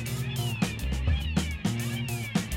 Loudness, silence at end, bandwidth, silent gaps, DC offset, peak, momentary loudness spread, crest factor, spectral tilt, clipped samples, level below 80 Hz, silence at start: -30 LUFS; 0 s; 17 kHz; none; under 0.1%; -12 dBFS; 3 LU; 16 dB; -5 dB/octave; under 0.1%; -36 dBFS; 0 s